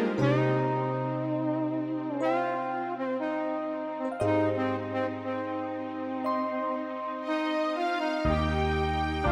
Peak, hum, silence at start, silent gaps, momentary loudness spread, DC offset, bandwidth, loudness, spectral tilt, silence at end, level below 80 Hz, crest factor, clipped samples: -12 dBFS; none; 0 s; none; 7 LU; under 0.1%; 10 kHz; -30 LUFS; -7.5 dB/octave; 0 s; -44 dBFS; 18 dB; under 0.1%